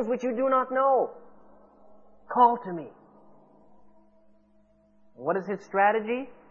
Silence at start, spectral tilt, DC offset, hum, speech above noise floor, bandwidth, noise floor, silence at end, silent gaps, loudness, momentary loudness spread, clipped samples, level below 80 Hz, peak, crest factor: 0 s; -7 dB/octave; under 0.1%; none; 36 dB; 7 kHz; -62 dBFS; 0.2 s; none; -26 LUFS; 13 LU; under 0.1%; -72 dBFS; -8 dBFS; 20 dB